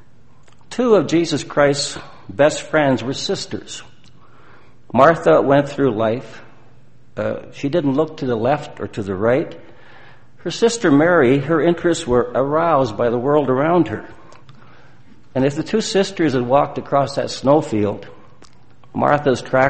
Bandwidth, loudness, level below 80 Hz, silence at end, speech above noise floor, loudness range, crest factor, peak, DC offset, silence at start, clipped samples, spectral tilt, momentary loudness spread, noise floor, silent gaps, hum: 8.8 kHz; -18 LUFS; -48 dBFS; 0 s; 34 dB; 5 LU; 18 dB; 0 dBFS; 1%; 0.7 s; under 0.1%; -5.5 dB/octave; 13 LU; -51 dBFS; none; none